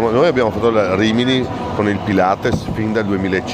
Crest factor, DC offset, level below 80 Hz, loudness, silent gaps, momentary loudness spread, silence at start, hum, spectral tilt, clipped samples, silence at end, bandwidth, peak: 14 dB; under 0.1%; -40 dBFS; -16 LUFS; none; 5 LU; 0 s; none; -6.5 dB/octave; under 0.1%; 0 s; 15 kHz; -2 dBFS